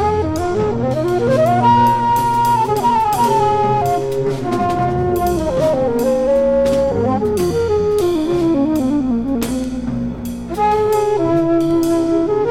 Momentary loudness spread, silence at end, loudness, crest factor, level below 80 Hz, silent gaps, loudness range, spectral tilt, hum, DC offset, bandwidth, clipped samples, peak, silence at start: 5 LU; 0 s; -16 LUFS; 12 dB; -36 dBFS; none; 3 LU; -7 dB/octave; none; under 0.1%; 17 kHz; under 0.1%; -2 dBFS; 0 s